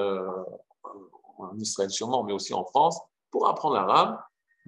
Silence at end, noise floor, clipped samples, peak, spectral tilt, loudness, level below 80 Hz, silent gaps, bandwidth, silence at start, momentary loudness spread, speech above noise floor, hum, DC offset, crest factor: 0.4 s; -49 dBFS; under 0.1%; -6 dBFS; -3.5 dB/octave; -26 LUFS; -84 dBFS; none; 11.5 kHz; 0 s; 22 LU; 23 dB; none; under 0.1%; 22 dB